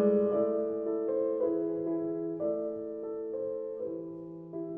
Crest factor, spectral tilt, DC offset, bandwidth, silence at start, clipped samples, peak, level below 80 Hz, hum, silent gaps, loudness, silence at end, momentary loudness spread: 16 dB; -12 dB/octave; under 0.1%; 3.2 kHz; 0 s; under 0.1%; -16 dBFS; -72 dBFS; none; none; -33 LUFS; 0 s; 11 LU